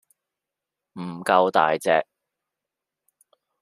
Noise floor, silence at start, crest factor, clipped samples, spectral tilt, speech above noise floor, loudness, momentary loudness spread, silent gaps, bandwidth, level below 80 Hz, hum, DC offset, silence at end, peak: -86 dBFS; 0.95 s; 22 dB; under 0.1%; -4.5 dB/octave; 65 dB; -21 LUFS; 18 LU; none; 15 kHz; -74 dBFS; none; under 0.1%; 1.6 s; -4 dBFS